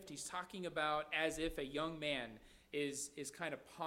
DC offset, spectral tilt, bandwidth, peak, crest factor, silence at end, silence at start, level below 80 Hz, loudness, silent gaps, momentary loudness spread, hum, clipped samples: under 0.1%; -3 dB/octave; 16 kHz; -24 dBFS; 20 dB; 0 s; 0 s; -62 dBFS; -42 LUFS; none; 8 LU; none; under 0.1%